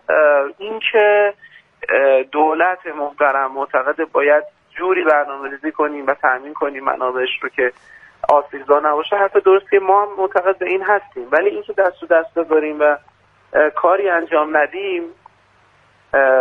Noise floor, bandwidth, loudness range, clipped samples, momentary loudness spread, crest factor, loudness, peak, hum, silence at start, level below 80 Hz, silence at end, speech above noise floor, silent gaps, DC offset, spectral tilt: -54 dBFS; 4.3 kHz; 3 LU; under 0.1%; 9 LU; 16 dB; -17 LUFS; 0 dBFS; none; 0.1 s; -64 dBFS; 0 s; 38 dB; none; under 0.1%; -5.5 dB/octave